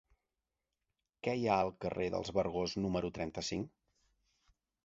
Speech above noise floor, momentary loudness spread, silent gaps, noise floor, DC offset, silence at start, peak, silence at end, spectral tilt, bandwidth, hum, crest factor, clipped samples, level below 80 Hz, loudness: 54 dB; 8 LU; none; -89 dBFS; under 0.1%; 1.25 s; -16 dBFS; 1.15 s; -5 dB/octave; 7.6 kHz; none; 22 dB; under 0.1%; -60 dBFS; -37 LUFS